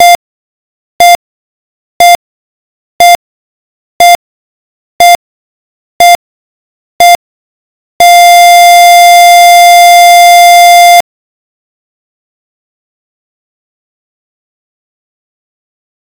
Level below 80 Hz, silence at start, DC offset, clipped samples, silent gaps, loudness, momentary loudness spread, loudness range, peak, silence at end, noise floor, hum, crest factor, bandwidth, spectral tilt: -50 dBFS; 0 s; 2%; 10%; 0.15-0.99 s, 1.15-2.00 s, 2.15-2.99 s, 3.15-4.00 s, 4.15-4.99 s, 5.15-6.00 s, 6.15-6.99 s, 7.15-8.00 s; -3 LUFS; 9 LU; 8 LU; 0 dBFS; 5 s; under -90 dBFS; none; 6 dB; over 20 kHz; 1 dB/octave